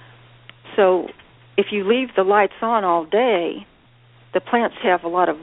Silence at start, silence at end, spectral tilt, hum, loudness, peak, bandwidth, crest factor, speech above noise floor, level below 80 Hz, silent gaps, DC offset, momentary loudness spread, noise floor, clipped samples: 0.65 s; 0 s; -2.5 dB/octave; none; -19 LUFS; -2 dBFS; 4 kHz; 18 dB; 33 dB; -62 dBFS; none; under 0.1%; 9 LU; -52 dBFS; under 0.1%